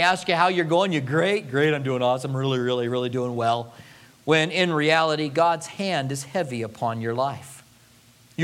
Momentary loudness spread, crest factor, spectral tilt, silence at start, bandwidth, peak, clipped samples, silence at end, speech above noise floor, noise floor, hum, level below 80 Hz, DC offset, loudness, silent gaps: 9 LU; 20 dB; -5 dB/octave; 0 s; 16 kHz; -4 dBFS; under 0.1%; 0 s; 31 dB; -54 dBFS; none; -68 dBFS; under 0.1%; -23 LUFS; none